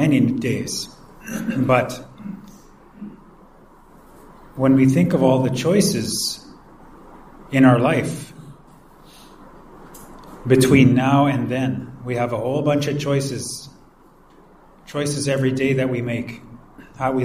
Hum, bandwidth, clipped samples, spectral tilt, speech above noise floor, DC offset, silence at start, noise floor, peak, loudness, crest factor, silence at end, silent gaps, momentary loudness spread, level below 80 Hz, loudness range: none; 15.5 kHz; under 0.1%; -6 dB/octave; 32 dB; under 0.1%; 0 s; -50 dBFS; -2 dBFS; -19 LUFS; 20 dB; 0 s; none; 22 LU; -50 dBFS; 7 LU